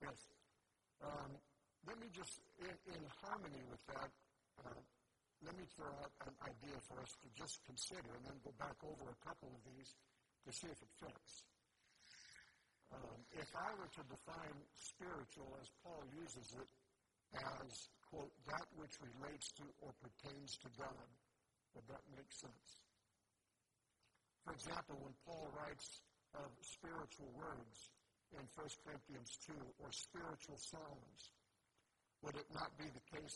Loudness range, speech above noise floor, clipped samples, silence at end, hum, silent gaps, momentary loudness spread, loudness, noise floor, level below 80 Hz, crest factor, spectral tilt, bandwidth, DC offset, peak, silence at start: 4 LU; 33 dB; under 0.1%; 0 s; none; none; 11 LU; -55 LUFS; -88 dBFS; -76 dBFS; 24 dB; -3.5 dB/octave; 11.5 kHz; under 0.1%; -32 dBFS; 0 s